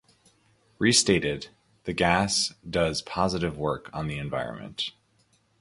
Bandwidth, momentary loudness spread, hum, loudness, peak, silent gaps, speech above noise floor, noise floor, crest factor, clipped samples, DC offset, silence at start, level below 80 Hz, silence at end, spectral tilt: 11.5 kHz; 13 LU; none; -26 LUFS; -6 dBFS; none; 40 dB; -66 dBFS; 22 dB; under 0.1%; under 0.1%; 0.8 s; -50 dBFS; 0.7 s; -3.5 dB/octave